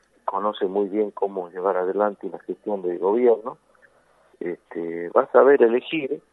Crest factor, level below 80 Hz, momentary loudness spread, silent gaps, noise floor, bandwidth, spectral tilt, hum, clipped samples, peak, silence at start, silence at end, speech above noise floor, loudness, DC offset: 20 dB; -76 dBFS; 16 LU; none; -59 dBFS; 4 kHz; -8 dB/octave; none; under 0.1%; -2 dBFS; 0.25 s; 0.15 s; 37 dB; -22 LUFS; under 0.1%